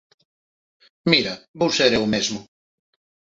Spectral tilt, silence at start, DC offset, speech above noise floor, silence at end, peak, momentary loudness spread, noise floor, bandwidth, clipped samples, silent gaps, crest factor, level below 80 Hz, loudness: -3.5 dB/octave; 1.05 s; under 0.1%; over 70 dB; 0.9 s; -2 dBFS; 10 LU; under -90 dBFS; 8 kHz; under 0.1%; 1.48-1.54 s; 22 dB; -56 dBFS; -20 LUFS